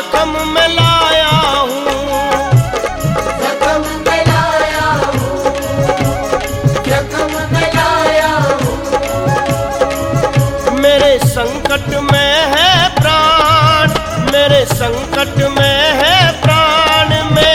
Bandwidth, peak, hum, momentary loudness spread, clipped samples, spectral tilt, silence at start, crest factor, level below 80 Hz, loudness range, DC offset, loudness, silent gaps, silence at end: 16.5 kHz; 0 dBFS; none; 7 LU; under 0.1%; -4.5 dB/octave; 0 s; 12 dB; -30 dBFS; 4 LU; under 0.1%; -11 LUFS; none; 0 s